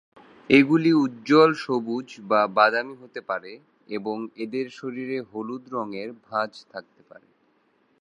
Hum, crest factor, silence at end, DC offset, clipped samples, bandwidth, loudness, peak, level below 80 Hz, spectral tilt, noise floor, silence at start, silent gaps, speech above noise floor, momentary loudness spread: none; 22 dB; 1.2 s; under 0.1%; under 0.1%; 10 kHz; -23 LUFS; -2 dBFS; -70 dBFS; -6.5 dB/octave; -65 dBFS; 0.5 s; none; 42 dB; 18 LU